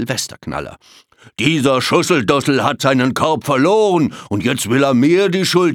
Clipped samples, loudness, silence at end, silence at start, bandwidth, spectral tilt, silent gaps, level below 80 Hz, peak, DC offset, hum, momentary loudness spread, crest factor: under 0.1%; -15 LUFS; 0 s; 0 s; 18 kHz; -5 dB/octave; none; -50 dBFS; 0 dBFS; under 0.1%; none; 11 LU; 14 dB